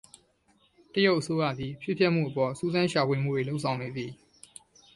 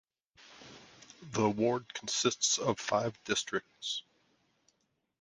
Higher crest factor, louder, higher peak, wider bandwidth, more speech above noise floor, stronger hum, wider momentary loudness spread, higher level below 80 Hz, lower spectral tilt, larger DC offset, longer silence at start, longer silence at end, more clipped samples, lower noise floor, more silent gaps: about the same, 20 dB vs 22 dB; first, -28 LUFS vs -32 LUFS; first, -10 dBFS vs -14 dBFS; about the same, 11.5 kHz vs 10.5 kHz; second, 39 dB vs 46 dB; neither; second, 14 LU vs 23 LU; first, -62 dBFS vs -70 dBFS; first, -6 dB/octave vs -3 dB/octave; neither; first, 0.95 s vs 0.5 s; second, 0.8 s vs 1.2 s; neither; second, -67 dBFS vs -78 dBFS; neither